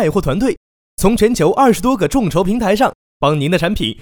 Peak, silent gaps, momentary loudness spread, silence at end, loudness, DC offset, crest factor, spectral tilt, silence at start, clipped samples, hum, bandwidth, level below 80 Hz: 0 dBFS; 0.57-0.97 s, 2.95-3.20 s; 6 LU; 0 s; -15 LUFS; under 0.1%; 14 dB; -5.5 dB/octave; 0 s; under 0.1%; none; over 20 kHz; -30 dBFS